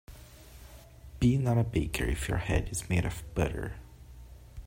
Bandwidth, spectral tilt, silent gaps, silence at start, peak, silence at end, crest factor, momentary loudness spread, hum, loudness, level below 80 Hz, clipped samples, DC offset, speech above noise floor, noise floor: 16 kHz; -6 dB/octave; none; 0.1 s; -14 dBFS; 0 s; 18 dB; 24 LU; none; -31 LUFS; -40 dBFS; under 0.1%; under 0.1%; 21 dB; -50 dBFS